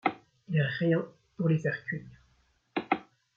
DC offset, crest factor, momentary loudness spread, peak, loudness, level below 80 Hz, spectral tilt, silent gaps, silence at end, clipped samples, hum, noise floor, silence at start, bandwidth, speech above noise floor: under 0.1%; 22 dB; 11 LU; -10 dBFS; -31 LUFS; -70 dBFS; -8.5 dB/octave; none; 0.35 s; under 0.1%; none; -69 dBFS; 0.05 s; 7 kHz; 40 dB